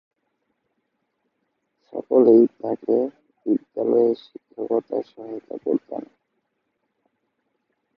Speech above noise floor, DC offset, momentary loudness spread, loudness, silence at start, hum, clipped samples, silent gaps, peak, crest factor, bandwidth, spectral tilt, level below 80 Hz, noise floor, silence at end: 54 dB; under 0.1%; 20 LU; -21 LUFS; 1.95 s; none; under 0.1%; none; -4 dBFS; 20 dB; 5.2 kHz; -10.5 dB/octave; -78 dBFS; -75 dBFS; 1.95 s